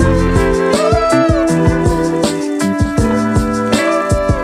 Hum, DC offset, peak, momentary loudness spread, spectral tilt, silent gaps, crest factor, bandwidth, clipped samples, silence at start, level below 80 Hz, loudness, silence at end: none; under 0.1%; 0 dBFS; 4 LU; -6 dB/octave; none; 12 dB; 14.5 kHz; under 0.1%; 0 s; -24 dBFS; -13 LUFS; 0 s